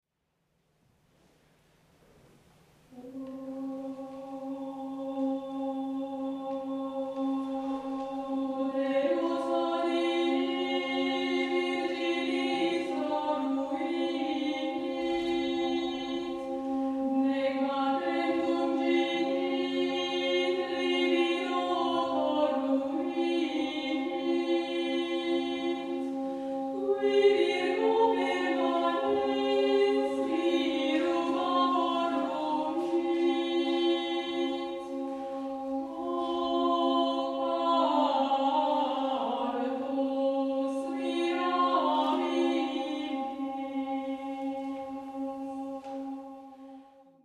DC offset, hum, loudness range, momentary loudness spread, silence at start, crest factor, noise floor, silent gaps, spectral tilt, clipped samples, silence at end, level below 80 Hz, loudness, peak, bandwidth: under 0.1%; none; 8 LU; 10 LU; 2.9 s; 18 dB; -78 dBFS; none; -4 dB/octave; under 0.1%; 0.4 s; -70 dBFS; -30 LUFS; -12 dBFS; 10.5 kHz